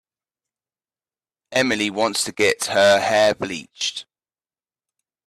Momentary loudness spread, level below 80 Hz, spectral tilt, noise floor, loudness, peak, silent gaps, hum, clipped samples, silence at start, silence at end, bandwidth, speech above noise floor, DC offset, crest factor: 10 LU; -62 dBFS; -2.5 dB/octave; under -90 dBFS; -19 LUFS; -4 dBFS; none; none; under 0.1%; 1.5 s; 1.25 s; 14 kHz; over 71 dB; under 0.1%; 18 dB